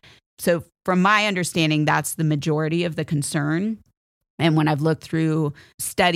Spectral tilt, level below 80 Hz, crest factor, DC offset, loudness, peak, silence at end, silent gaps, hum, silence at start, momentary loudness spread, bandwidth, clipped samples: -5 dB/octave; -58 dBFS; 18 dB; under 0.1%; -22 LUFS; -4 dBFS; 0 s; 3.97-4.21 s, 4.30-4.38 s, 5.74-5.78 s; none; 0.4 s; 8 LU; 16 kHz; under 0.1%